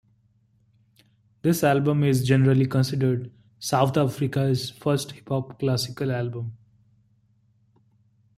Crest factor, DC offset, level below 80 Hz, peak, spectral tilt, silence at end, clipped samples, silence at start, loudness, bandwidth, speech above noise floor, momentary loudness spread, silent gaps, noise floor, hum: 20 dB; under 0.1%; -60 dBFS; -6 dBFS; -6.5 dB/octave; 1.8 s; under 0.1%; 1.45 s; -24 LUFS; 15.5 kHz; 41 dB; 10 LU; none; -64 dBFS; none